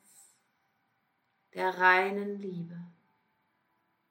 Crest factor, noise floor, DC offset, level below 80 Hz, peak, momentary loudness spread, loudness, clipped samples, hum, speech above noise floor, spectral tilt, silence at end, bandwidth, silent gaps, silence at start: 24 dB; -76 dBFS; under 0.1%; under -90 dBFS; -10 dBFS; 22 LU; -28 LUFS; under 0.1%; none; 47 dB; -5.5 dB/octave; 1.2 s; 16.5 kHz; none; 1.55 s